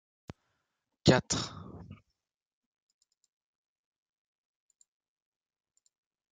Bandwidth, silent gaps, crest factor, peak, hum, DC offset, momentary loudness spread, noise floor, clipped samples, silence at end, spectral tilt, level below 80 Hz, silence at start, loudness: 9.4 kHz; none; 28 dB; -10 dBFS; none; under 0.1%; 23 LU; -85 dBFS; under 0.1%; 4.35 s; -4.5 dB/octave; -62 dBFS; 1.05 s; -29 LUFS